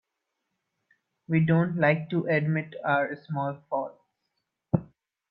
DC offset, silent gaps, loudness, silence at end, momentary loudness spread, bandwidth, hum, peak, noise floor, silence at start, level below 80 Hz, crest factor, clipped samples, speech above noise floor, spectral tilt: under 0.1%; none; -27 LUFS; 0.45 s; 9 LU; 4.9 kHz; none; -8 dBFS; -82 dBFS; 1.3 s; -64 dBFS; 20 dB; under 0.1%; 56 dB; -11 dB/octave